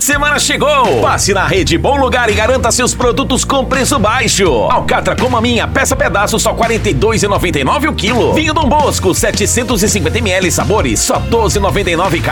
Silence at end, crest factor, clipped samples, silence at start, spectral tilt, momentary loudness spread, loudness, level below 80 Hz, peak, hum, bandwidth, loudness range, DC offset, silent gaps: 0 s; 10 dB; under 0.1%; 0 s; -3.5 dB/octave; 2 LU; -11 LUFS; -24 dBFS; 0 dBFS; none; 19 kHz; 1 LU; under 0.1%; none